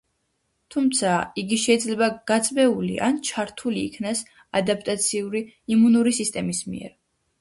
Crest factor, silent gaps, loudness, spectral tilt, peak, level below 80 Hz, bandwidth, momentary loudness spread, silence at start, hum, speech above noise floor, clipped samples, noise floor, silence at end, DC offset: 18 dB; none; -23 LUFS; -4 dB/octave; -6 dBFS; -60 dBFS; 11.5 kHz; 10 LU; 0.7 s; none; 50 dB; under 0.1%; -73 dBFS; 0.5 s; under 0.1%